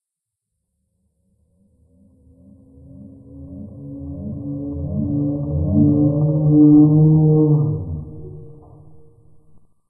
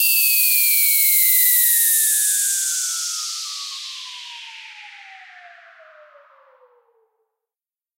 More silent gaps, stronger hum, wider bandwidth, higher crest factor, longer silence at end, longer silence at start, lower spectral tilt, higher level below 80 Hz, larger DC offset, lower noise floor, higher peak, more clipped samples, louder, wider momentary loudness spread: neither; neither; second, 1.3 kHz vs 16.5 kHz; about the same, 16 dB vs 18 dB; second, 1.4 s vs 2.5 s; first, 3.05 s vs 0 s; first, -18 dB/octave vs 10.5 dB/octave; first, -42 dBFS vs under -90 dBFS; neither; second, -82 dBFS vs under -90 dBFS; about the same, -2 dBFS vs -2 dBFS; neither; about the same, -16 LUFS vs -14 LUFS; first, 24 LU vs 21 LU